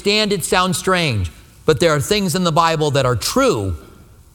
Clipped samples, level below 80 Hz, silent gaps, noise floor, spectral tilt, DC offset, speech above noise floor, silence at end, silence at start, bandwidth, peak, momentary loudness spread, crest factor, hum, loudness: under 0.1%; -40 dBFS; none; -44 dBFS; -4.5 dB/octave; under 0.1%; 27 dB; 0.5 s; 0 s; 19.5 kHz; 0 dBFS; 8 LU; 18 dB; none; -17 LUFS